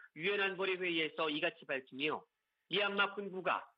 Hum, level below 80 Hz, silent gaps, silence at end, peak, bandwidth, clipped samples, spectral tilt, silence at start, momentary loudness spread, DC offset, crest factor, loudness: none; -88 dBFS; none; 0.1 s; -20 dBFS; 5.6 kHz; under 0.1%; -6.5 dB/octave; 0 s; 6 LU; under 0.1%; 18 dB; -36 LUFS